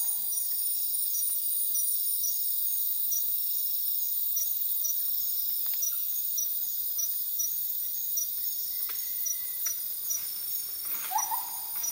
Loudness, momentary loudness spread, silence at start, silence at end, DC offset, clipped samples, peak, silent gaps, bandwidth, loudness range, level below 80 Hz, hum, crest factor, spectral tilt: -27 LUFS; 4 LU; 0 s; 0 s; under 0.1%; under 0.1%; -16 dBFS; none; 16.5 kHz; 4 LU; -74 dBFS; none; 14 dB; 2.5 dB/octave